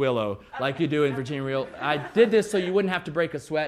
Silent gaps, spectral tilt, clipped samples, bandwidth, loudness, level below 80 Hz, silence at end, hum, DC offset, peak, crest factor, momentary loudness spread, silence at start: none; -6 dB/octave; under 0.1%; 13.5 kHz; -25 LUFS; -60 dBFS; 0 s; none; under 0.1%; -6 dBFS; 18 dB; 9 LU; 0 s